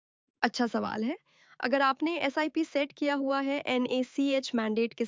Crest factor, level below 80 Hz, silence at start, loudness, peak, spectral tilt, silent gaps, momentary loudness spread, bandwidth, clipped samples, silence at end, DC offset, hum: 20 dB; -76 dBFS; 0.4 s; -30 LUFS; -10 dBFS; -4.5 dB/octave; none; 6 LU; 7.6 kHz; under 0.1%; 0 s; under 0.1%; none